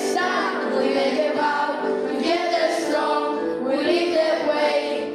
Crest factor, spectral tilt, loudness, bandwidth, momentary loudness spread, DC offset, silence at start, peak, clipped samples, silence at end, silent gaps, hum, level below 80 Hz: 12 dB; -3 dB/octave; -22 LUFS; 14.5 kHz; 3 LU; under 0.1%; 0 s; -8 dBFS; under 0.1%; 0 s; none; none; -68 dBFS